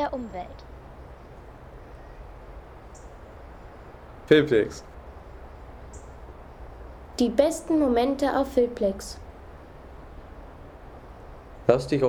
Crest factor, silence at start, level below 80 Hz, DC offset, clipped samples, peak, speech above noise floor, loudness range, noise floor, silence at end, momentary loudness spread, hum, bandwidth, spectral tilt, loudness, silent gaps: 22 dB; 0 s; -46 dBFS; under 0.1%; under 0.1%; -6 dBFS; 22 dB; 19 LU; -45 dBFS; 0 s; 24 LU; none; 17.5 kHz; -6 dB/octave; -24 LUFS; none